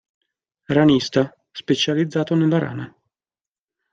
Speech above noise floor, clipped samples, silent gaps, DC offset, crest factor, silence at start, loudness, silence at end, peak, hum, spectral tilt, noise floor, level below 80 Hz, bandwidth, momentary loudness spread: over 71 dB; under 0.1%; none; under 0.1%; 18 dB; 0.7 s; -19 LUFS; 1.05 s; -4 dBFS; none; -6 dB/octave; under -90 dBFS; -58 dBFS; 7.6 kHz; 15 LU